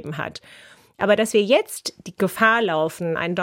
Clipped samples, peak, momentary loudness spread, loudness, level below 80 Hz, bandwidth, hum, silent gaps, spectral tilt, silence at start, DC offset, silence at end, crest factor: under 0.1%; -2 dBFS; 13 LU; -21 LUFS; -62 dBFS; 16.5 kHz; none; none; -4 dB/octave; 0 s; under 0.1%; 0 s; 18 dB